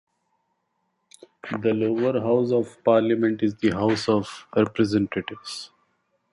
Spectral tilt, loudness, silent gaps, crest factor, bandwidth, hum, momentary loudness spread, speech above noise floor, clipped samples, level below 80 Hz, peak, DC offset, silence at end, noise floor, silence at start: -6.5 dB/octave; -23 LUFS; none; 18 dB; 11.5 kHz; none; 13 LU; 52 dB; under 0.1%; -58 dBFS; -6 dBFS; under 0.1%; 0.65 s; -74 dBFS; 1.45 s